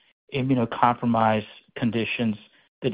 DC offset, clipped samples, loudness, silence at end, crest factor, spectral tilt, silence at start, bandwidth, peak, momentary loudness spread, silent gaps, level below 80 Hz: under 0.1%; under 0.1%; -24 LUFS; 0 s; 22 dB; -11 dB/octave; 0.3 s; 5 kHz; -4 dBFS; 11 LU; 2.68-2.82 s; -58 dBFS